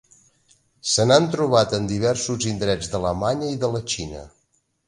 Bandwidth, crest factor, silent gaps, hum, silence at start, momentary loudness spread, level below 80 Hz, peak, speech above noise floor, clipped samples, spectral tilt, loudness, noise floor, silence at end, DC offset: 11.5 kHz; 22 dB; none; none; 0.85 s; 11 LU; -46 dBFS; -2 dBFS; 47 dB; under 0.1%; -4.5 dB/octave; -21 LUFS; -68 dBFS; 0.6 s; under 0.1%